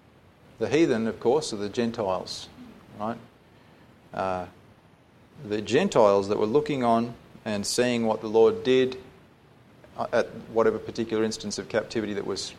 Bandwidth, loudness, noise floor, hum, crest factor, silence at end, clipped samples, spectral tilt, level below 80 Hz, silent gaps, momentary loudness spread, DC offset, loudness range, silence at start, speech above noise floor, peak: 14 kHz; -26 LUFS; -56 dBFS; none; 20 dB; 0 s; under 0.1%; -5 dB/octave; -60 dBFS; none; 15 LU; under 0.1%; 9 LU; 0.6 s; 31 dB; -6 dBFS